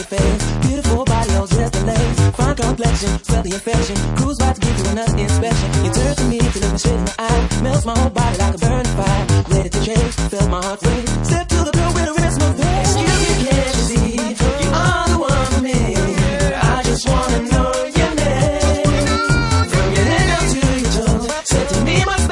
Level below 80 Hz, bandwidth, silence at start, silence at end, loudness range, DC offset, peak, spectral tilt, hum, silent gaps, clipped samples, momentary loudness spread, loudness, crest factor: -22 dBFS; 11.5 kHz; 0 s; 0 s; 2 LU; under 0.1%; -2 dBFS; -5 dB/octave; none; none; under 0.1%; 3 LU; -16 LUFS; 14 dB